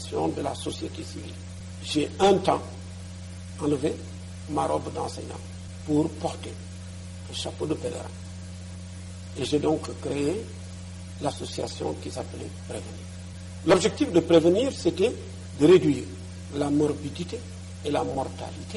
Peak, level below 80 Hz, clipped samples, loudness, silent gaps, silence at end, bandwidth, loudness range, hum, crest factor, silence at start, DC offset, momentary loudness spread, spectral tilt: -8 dBFS; -52 dBFS; under 0.1%; -26 LUFS; none; 0 s; 11.5 kHz; 10 LU; none; 20 dB; 0 s; under 0.1%; 19 LU; -5.5 dB/octave